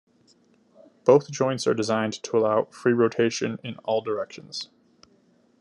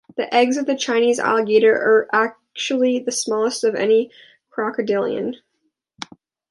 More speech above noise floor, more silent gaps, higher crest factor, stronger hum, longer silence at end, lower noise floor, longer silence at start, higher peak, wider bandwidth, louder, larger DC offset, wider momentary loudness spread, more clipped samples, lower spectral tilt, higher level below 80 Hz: second, 38 dB vs 53 dB; neither; about the same, 20 dB vs 16 dB; neither; second, 0.95 s vs 1.15 s; second, -61 dBFS vs -72 dBFS; first, 1.05 s vs 0.15 s; second, -6 dBFS vs -2 dBFS; about the same, 11 kHz vs 11.5 kHz; second, -24 LUFS vs -19 LUFS; neither; second, 14 LU vs 17 LU; neither; first, -5 dB/octave vs -3 dB/octave; about the same, -74 dBFS vs -72 dBFS